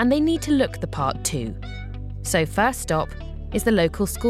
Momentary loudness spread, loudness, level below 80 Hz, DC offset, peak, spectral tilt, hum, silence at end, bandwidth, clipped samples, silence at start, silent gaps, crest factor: 14 LU; -23 LUFS; -36 dBFS; under 0.1%; -8 dBFS; -5 dB/octave; none; 0 s; 16 kHz; under 0.1%; 0 s; none; 16 dB